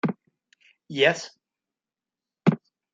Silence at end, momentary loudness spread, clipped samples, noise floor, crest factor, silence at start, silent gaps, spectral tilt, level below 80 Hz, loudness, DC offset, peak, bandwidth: 0.35 s; 18 LU; under 0.1%; under -90 dBFS; 24 dB; 0.05 s; none; -5.5 dB/octave; -74 dBFS; -25 LUFS; under 0.1%; -6 dBFS; 9 kHz